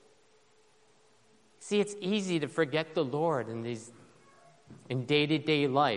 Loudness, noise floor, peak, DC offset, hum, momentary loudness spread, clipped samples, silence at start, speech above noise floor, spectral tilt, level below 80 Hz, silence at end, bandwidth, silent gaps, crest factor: -31 LUFS; -66 dBFS; -12 dBFS; under 0.1%; none; 12 LU; under 0.1%; 1.6 s; 36 dB; -5.5 dB/octave; -76 dBFS; 0 s; 11 kHz; none; 20 dB